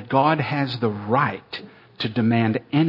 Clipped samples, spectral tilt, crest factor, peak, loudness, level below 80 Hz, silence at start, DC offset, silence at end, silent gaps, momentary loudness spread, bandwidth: under 0.1%; -9 dB/octave; 18 dB; -4 dBFS; -22 LUFS; -64 dBFS; 0 s; under 0.1%; 0 s; none; 13 LU; 6 kHz